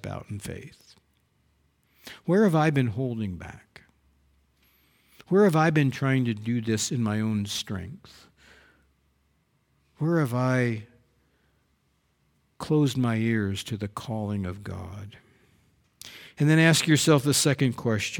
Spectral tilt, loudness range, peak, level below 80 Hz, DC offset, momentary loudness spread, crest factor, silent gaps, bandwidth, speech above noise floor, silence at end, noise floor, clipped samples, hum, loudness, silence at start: -5 dB/octave; 7 LU; -6 dBFS; -60 dBFS; under 0.1%; 21 LU; 20 dB; none; 19 kHz; 45 dB; 0 s; -70 dBFS; under 0.1%; none; -25 LUFS; 0.05 s